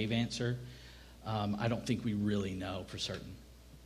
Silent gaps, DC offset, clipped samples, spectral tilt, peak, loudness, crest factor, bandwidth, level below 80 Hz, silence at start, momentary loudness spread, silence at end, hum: none; under 0.1%; under 0.1%; -5.5 dB/octave; -20 dBFS; -37 LUFS; 18 dB; 15 kHz; -58 dBFS; 0 s; 18 LU; 0 s; none